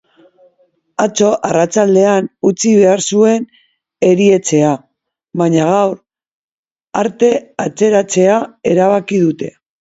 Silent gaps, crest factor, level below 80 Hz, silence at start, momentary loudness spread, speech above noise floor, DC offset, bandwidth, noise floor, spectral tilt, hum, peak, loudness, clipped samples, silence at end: 6.31-6.63 s, 6.72-6.76 s; 14 dB; -58 dBFS; 1 s; 12 LU; 45 dB; under 0.1%; 8 kHz; -57 dBFS; -5.5 dB/octave; none; 0 dBFS; -13 LUFS; under 0.1%; 0.3 s